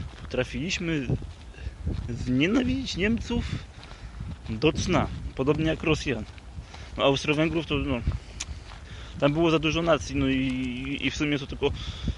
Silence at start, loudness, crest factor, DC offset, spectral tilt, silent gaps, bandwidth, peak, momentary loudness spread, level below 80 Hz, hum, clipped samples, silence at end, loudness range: 0 s; -27 LUFS; 20 dB; under 0.1%; -5.5 dB/octave; none; 11.5 kHz; -8 dBFS; 17 LU; -38 dBFS; none; under 0.1%; 0 s; 3 LU